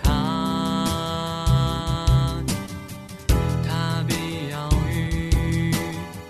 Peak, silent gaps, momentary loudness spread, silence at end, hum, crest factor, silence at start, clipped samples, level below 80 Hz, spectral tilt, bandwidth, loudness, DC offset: -6 dBFS; none; 8 LU; 0 s; none; 16 dB; 0 s; under 0.1%; -28 dBFS; -5.5 dB/octave; 14 kHz; -24 LUFS; under 0.1%